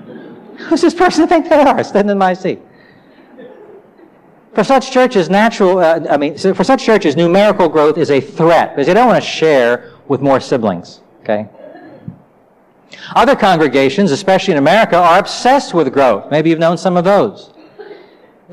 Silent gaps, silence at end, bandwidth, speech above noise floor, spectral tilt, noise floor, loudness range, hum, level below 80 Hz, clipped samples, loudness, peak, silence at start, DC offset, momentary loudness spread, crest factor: none; 0.6 s; 15 kHz; 38 dB; -5.5 dB/octave; -49 dBFS; 6 LU; none; -50 dBFS; under 0.1%; -12 LUFS; -2 dBFS; 0.05 s; under 0.1%; 10 LU; 10 dB